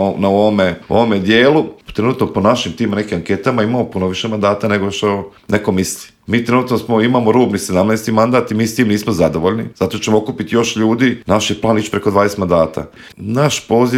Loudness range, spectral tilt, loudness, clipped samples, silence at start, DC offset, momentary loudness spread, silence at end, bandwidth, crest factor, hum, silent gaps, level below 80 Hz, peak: 3 LU; -5.5 dB/octave; -15 LUFS; under 0.1%; 0 s; under 0.1%; 6 LU; 0 s; 16 kHz; 14 dB; none; none; -48 dBFS; 0 dBFS